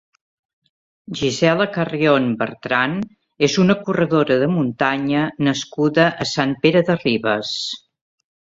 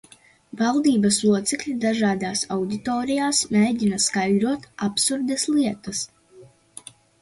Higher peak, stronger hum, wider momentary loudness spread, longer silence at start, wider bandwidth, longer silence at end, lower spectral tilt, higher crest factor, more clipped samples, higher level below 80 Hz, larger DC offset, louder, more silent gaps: first, -2 dBFS vs -8 dBFS; neither; about the same, 8 LU vs 10 LU; first, 1.1 s vs 0.55 s; second, 8 kHz vs 11.5 kHz; about the same, 0.75 s vs 0.8 s; first, -5.5 dB/octave vs -3.5 dB/octave; about the same, 18 dB vs 16 dB; neither; about the same, -56 dBFS vs -58 dBFS; neither; first, -18 LUFS vs -22 LUFS; neither